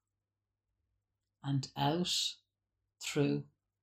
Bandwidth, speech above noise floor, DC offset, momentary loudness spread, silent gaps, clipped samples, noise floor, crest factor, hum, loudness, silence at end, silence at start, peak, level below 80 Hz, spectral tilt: 16 kHz; over 56 dB; under 0.1%; 12 LU; none; under 0.1%; under -90 dBFS; 18 dB; none; -35 LUFS; 0.4 s; 1.45 s; -20 dBFS; -72 dBFS; -4.5 dB/octave